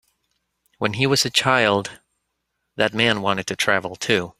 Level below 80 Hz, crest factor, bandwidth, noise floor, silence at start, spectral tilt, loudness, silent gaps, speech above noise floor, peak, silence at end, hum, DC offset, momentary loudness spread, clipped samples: -58 dBFS; 20 dB; 16 kHz; -76 dBFS; 0.8 s; -3.5 dB/octave; -20 LUFS; none; 56 dB; -2 dBFS; 0.1 s; none; under 0.1%; 9 LU; under 0.1%